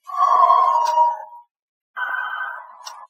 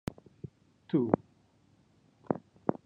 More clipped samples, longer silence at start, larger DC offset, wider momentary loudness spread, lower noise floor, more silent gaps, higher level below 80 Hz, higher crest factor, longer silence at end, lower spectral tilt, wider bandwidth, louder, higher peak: neither; second, 0.05 s vs 0.9 s; neither; about the same, 20 LU vs 21 LU; second, -39 dBFS vs -66 dBFS; first, 1.51-1.94 s vs none; second, under -90 dBFS vs -64 dBFS; second, 18 dB vs 30 dB; about the same, 0.05 s vs 0.1 s; second, 3 dB/octave vs -9 dB/octave; first, 15 kHz vs 9.6 kHz; first, -18 LUFS vs -33 LUFS; first, -2 dBFS vs -6 dBFS